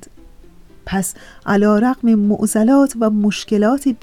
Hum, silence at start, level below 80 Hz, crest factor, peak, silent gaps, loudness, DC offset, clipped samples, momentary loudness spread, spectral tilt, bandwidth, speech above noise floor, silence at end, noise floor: none; 0.85 s; -44 dBFS; 12 dB; -6 dBFS; none; -16 LUFS; 0.4%; under 0.1%; 8 LU; -5.5 dB/octave; 15 kHz; 28 dB; 0.1 s; -43 dBFS